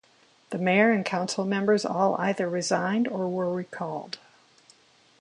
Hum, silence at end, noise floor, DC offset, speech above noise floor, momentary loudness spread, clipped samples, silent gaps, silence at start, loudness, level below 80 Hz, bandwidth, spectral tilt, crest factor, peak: none; 1.05 s; -60 dBFS; under 0.1%; 34 dB; 13 LU; under 0.1%; none; 0.5 s; -26 LUFS; -74 dBFS; 11 kHz; -5 dB/octave; 20 dB; -8 dBFS